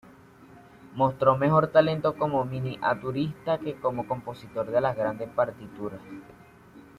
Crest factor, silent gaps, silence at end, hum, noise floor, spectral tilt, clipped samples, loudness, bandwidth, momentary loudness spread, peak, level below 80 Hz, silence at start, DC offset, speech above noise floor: 22 dB; none; 0.2 s; none; -52 dBFS; -8.5 dB/octave; under 0.1%; -26 LUFS; 13.5 kHz; 16 LU; -6 dBFS; -60 dBFS; 0.4 s; under 0.1%; 25 dB